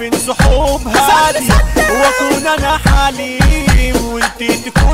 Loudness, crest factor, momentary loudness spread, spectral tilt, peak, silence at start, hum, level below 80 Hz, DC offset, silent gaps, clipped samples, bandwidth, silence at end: -12 LUFS; 10 dB; 6 LU; -4.5 dB/octave; 0 dBFS; 0 s; none; -16 dBFS; 0.7%; none; under 0.1%; 16.5 kHz; 0 s